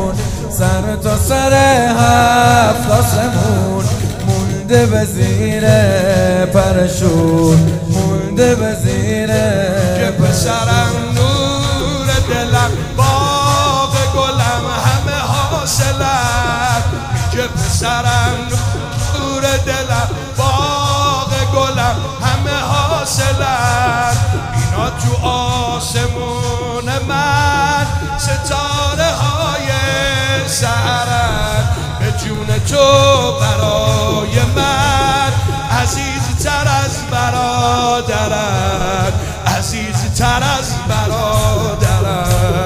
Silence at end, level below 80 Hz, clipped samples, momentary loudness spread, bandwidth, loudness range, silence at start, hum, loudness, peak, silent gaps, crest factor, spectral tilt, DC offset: 0 s; -26 dBFS; under 0.1%; 6 LU; 16 kHz; 3 LU; 0 s; none; -14 LUFS; 0 dBFS; none; 14 dB; -4.5 dB/octave; under 0.1%